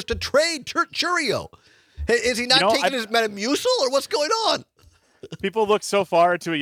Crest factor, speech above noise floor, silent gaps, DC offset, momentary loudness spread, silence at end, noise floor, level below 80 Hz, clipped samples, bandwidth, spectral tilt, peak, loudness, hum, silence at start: 20 dB; 35 dB; none; under 0.1%; 9 LU; 0 s; -57 dBFS; -46 dBFS; under 0.1%; 18.5 kHz; -2.5 dB/octave; -2 dBFS; -21 LUFS; none; 0 s